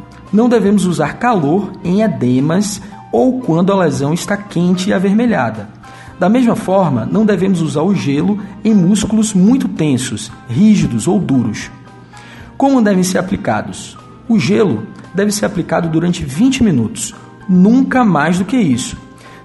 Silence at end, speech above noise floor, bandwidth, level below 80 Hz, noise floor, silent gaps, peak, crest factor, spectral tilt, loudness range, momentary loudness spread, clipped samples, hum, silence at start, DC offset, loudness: 0.05 s; 23 dB; 12 kHz; -42 dBFS; -36 dBFS; none; 0 dBFS; 12 dB; -6 dB/octave; 3 LU; 10 LU; under 0.1%; none; 0 s; under 0.1%; -14 LUFS